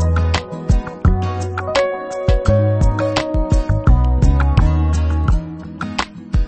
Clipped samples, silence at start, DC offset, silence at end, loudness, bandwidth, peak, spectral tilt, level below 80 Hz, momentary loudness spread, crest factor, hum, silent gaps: under 0.1%; 0 s; under 0.1%; 0 s; -18 LUFS; 8.8 kHz; 0 dBFS; -7 dB/octave; -18 dBFS; 8 LU; 14 dB; none; none